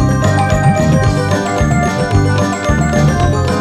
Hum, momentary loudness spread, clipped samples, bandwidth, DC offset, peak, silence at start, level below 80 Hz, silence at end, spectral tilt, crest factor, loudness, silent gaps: none; 3 LU; under 0.1%; 13.5 kHz; under 0.1%; 0 dBFS; 0 s; -24 dBFS; 0 s; -6.5 dB/octave; 12 dB; -13 LUFS; none